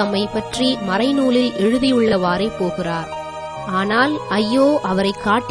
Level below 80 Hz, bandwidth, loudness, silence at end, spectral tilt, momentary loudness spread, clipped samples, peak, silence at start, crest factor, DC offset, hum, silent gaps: -46 dBFS; 11 kHz; -18 LUFS; 0 s; -5.5 dB/octave; 8 LU; under 0.1%; -4 dBFS; 0 s; 14 dB; 0.1%; none; none